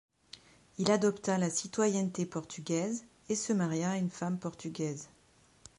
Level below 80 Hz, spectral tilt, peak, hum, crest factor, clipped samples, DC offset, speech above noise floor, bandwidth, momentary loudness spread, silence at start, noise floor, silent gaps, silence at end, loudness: -72 dBFS; -5 dB/octave; -12 dBFS; none; 22 dB; under 0.1%; under 0.1%; 27 dB; 11.5 kHz; 20 LU; 0.35 s; -60 dBFS; none; 0.75 s; -33 LUFS